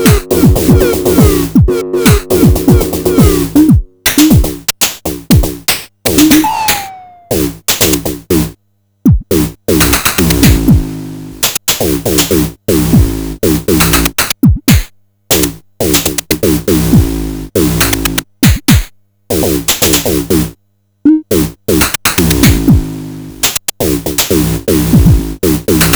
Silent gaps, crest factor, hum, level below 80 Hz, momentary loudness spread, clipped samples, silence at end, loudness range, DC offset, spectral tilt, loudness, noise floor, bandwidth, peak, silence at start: none; 10 dB; none; -20 dBFS; 7 LU; 0.4%; 0 s; 3 LU; under 0.1%; -4.5 dB/octave; -10 LUFS; -58 dBFS; over 20 kHz; 0 dBFS; 0 s